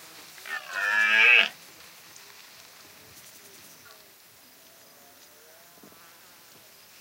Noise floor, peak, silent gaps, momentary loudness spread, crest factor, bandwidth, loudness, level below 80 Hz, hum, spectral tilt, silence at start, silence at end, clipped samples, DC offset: -54 dBFS; -4 dBFS; none; 31 LU; 26 dB; 16 kHz; -20 LUFS; -82 dBFS; none; 0.5 dB/octave; 0.45 s; 5.5 s; under 0.1%; under 0.1%